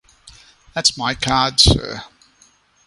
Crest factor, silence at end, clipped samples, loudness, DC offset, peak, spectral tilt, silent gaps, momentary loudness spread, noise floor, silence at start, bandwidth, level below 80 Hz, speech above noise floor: 20 dB; 0.8 s; under 0.1%; -15 LUFS; under 0.1%; 0 dBFS; -3 dB/octave; none; 17 LU; -55 dBFS; 0.25 s; 11.5 kHz; -32 dBFS; 38 dB